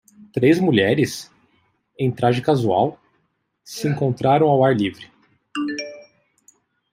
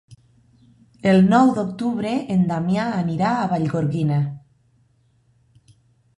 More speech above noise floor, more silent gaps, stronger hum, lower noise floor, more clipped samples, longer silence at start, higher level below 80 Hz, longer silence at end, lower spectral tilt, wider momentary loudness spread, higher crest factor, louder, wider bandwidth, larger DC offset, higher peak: first, 51 dB vs 42 dB; neither; neither; first, -69 dBFS vs -61 dBFS; neither; second, 0.35 s vs 1.05 s; about the same, -60 dBFS vs -56 dBFS; second, 0.9 s vs 1.8 s; second, -6.5 dB/octave vs -8 dB/octave; first, 14 LU vs 9 LU; about the same, 18 dB vs 18 dB; about the same, -19 LUFS vs -20 LUFS; first, 16 kHz vs 10.5 kHz; neither; about the same, -4 dBFS vs -2 dBFS